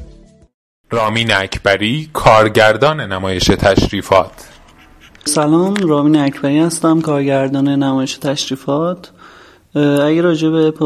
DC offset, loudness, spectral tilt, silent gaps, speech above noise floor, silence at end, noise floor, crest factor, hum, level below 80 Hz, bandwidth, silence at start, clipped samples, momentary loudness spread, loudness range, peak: under 0.1%; -14 LUFS; -5 dB/octave; 0.54-0.84 s; 30 dB; 0 s; -43 dBFS; 14 dB; none; -36 dBFS; 14.5 kHz; 0 s; under 0.1%; 8 LU; 3 LU; 0 dBFS